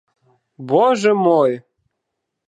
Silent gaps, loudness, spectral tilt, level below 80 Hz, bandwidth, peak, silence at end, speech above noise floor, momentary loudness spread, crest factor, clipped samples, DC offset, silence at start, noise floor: none; -16 LUFS; -6 dB/octave; -76 dBFS; 10 kHz; -2 dBFS; 0.9 s; 63 dB; 14 LU; 16 dB; under 0.1%; under 0.1%; 0.6 s; -78 dBFS